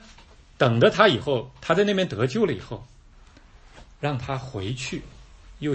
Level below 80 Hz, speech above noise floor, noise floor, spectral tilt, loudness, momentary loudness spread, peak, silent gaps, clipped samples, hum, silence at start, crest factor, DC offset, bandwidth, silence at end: -50 dBFS; 27 dB; -50 dBFS; -6 dB/octave; -23 LUFS; 14 LU; -4 dBFS; none; under 0.1%; none; 0.6 s; 22 dB; under 0.1%; 8.8 kHz; 0 s